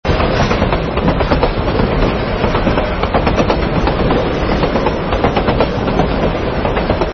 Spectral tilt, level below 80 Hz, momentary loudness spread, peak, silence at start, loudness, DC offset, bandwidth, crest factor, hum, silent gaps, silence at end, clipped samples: -7 dB/octave; -22 dBFS; 2 LU; 0 dBFS; 0.05 s; -15 LUFS; under 0.1%; 6.6 kHz; 14 dB; none; none; 0 s; under 0.1%